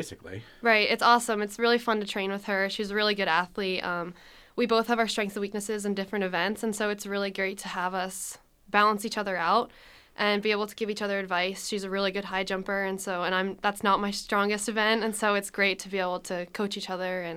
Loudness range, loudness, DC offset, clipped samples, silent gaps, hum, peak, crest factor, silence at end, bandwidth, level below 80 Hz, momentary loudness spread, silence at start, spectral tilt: 4 LU; -27 LUFS; under 0.1%; under 0.1%; none; none; -6 dBFS; 22 dB; 0 s; 16.5 kHz; -62 dBFS; 8 LU; 0 s; -3.5 dB/octave